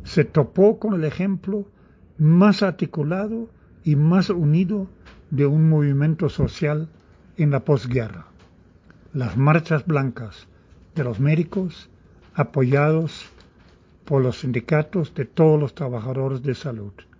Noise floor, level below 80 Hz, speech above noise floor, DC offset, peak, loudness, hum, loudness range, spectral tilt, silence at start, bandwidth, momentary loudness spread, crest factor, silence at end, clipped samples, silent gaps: -52 dBFS; -48 dBFS; 32 dB; under 0.1%; -4 dBFS; -21 LUFS; none; 4 LU; -9 dB/octave; 0 s; 7.6 kHz; 14 LU; 18 dB; 0.3 s; under 0.1%; none